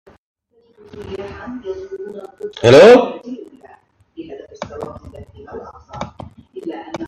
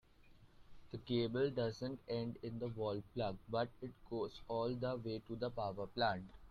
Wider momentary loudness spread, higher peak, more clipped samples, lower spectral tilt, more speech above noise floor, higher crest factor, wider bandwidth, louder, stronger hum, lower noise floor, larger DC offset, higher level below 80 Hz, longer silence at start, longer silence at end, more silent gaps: first, 27 LU vs 8 LU; first, 0 dBFS vs -24 dBFS; neither; second, -5.5 dB/octave vs -7.5 dB/octave; first, 35 dB vs 23 dB; about the same, 18 dB vs 18 dB; first, 10.5 kHz vs 7.4 kHz; first, -9 LUFS vs -42 LUFS; neither; second, -51 dBFS vs -64 dBFS; neither; first, -50 dBFS vs -64 dBFS; first, 0.95 s vs 0.25 s; about the same, 0 s vs 0 s; neither